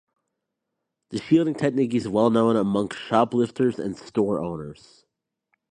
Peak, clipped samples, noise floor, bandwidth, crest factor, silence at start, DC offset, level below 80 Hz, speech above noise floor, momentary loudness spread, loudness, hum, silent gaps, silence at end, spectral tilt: -4 dBFS; under 0.1%; -82 dBFS; 10 kHz; 20 dB; 1.1 s; under 0.1%; -60 dBFS; 59 dB; 12 LU; -23 LUFS; none; none; 1 s; -7 dB/octave